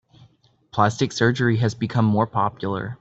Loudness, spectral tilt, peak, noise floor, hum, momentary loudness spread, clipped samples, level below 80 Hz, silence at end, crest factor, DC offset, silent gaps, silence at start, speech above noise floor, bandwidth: -22 LUFS; -6.5 dB/octave; -4 dBFS; -57 dBFS; none; 7 LU; under 0.1%; -56 dBFS; 0.05 s; 18 dB; under 0.1%; none; 0.75 s; 36 dB; 8 kHz